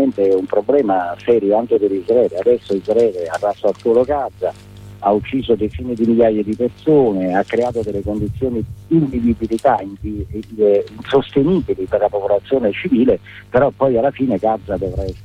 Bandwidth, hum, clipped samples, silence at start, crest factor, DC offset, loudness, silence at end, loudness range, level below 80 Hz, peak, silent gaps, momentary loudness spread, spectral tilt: 10.5 kHz; none; under 0.1%; 0 s; 14 dB; under 0.1%; -17 LUFS; 0 s; 2 LU; -38 dBFS; -2 dBFS; none; 7 LU; -8 dB/octave